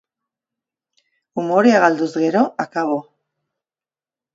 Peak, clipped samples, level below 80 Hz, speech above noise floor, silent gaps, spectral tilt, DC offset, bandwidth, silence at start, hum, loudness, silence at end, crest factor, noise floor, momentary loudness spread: 0 dBFS; under 0.1%; -72 dBFS; over 74 dB; none; -6 dB/octave; under 0.1%; 7.8 kHz; 1.35 s; none; -17 LUFS; 1.35 s; 20 dB; under -90 dBFS; 13 LU